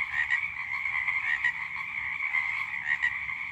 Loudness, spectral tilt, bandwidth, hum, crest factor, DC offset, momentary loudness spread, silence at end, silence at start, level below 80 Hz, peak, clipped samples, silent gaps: -28 LUFS; -1.5 dB/octave; 13.5 kHz; none; 16 dB; under 0.1%; 5 LU; 0 s; 0 s; -62 dBFS; -14 dBFS; under 0.1%; none